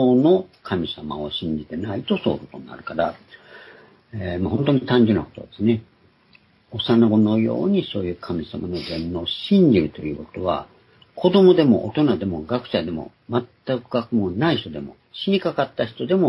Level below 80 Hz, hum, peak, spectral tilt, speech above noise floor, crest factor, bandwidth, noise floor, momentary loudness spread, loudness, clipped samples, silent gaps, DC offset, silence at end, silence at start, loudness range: -54 dBFS; none; -2 dBFS; -9 dB/octave; 35 dB; 18 dB; 11 kHz; -56 dBFS; 14 LU; -21 LUFS; under 0.1%; none; under 0.1%; 0 s; 0 s; 7 LU